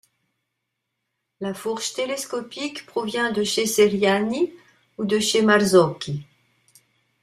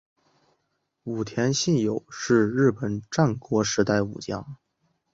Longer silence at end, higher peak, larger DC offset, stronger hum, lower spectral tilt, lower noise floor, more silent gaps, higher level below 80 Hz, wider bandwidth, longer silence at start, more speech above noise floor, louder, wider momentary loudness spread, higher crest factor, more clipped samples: first, 1 s vs 0.6 s; first, -2 dBFS vs -6 dBFS; neither; neither; second, -4 dB/octave vs -5.5 dB/octave; about the same, -79 dBFS vs -76 dBFS; neither; second, -64 dBFS vs -56 dBFS; first, 15.5 kHz vs 8 kHz; first, 1.4 s vs 1.05 s; first, 58 dB vs 52 dB; first, -22 LUFS vs -25 LUFS; about the same, 13 LU vs 12 LU; about the same, 20 dB vs 20 dB; neither